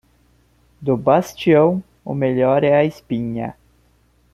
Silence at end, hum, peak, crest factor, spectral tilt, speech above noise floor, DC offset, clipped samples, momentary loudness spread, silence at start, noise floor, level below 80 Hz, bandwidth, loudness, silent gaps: 0.8 s; 60 Hz at -50 dBFS; -2 dBFS; 18 dB; -7.5 dB/octave; 41 dB; under 0.1%; under 0.1%; 13 LU; 0.8 s; -57 dBFS; -54 dBFS; 14.5 kHz; -18 LUFS; none